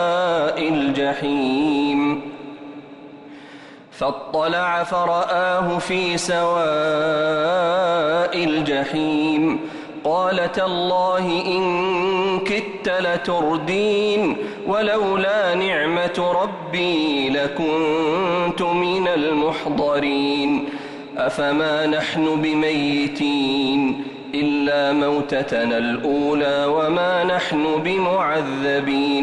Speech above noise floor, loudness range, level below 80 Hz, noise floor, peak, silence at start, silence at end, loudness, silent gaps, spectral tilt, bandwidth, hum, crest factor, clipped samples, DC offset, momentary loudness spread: 22 dB; 3 LU; -56 dBFS; -41 dBFS; -10 dBFS; 0 s; 0 s; -20 LUFS; none; -5 dB/octave; 11.5 kHz; none; 10 dB; under 0.1%; under 0.1%; 5 LU